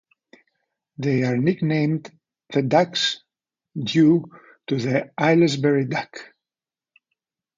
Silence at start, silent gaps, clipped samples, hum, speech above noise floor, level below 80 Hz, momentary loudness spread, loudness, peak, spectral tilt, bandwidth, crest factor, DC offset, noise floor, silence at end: 1 s; none; under 0.1%; none; over 70 dB; -66 dBFS; 17 LU; -21 LUFS; -4 dBFS; -6 dB/octave; 7.6 kHz; 20 dB; under 0.1%; under -90 dBFS; 1.35 s